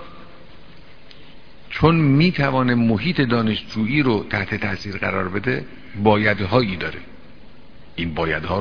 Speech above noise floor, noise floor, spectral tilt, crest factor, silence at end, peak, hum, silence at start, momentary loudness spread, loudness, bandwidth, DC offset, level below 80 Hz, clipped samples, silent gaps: 26 dB; -46 dBFS; -8 dB/octave; 20 dB; 0 s; 0 dBFS; none; 0 s; 11 LU; -20 LUFS; 5.4 kHz; 1%; -44 dBFS; under 0.1%; none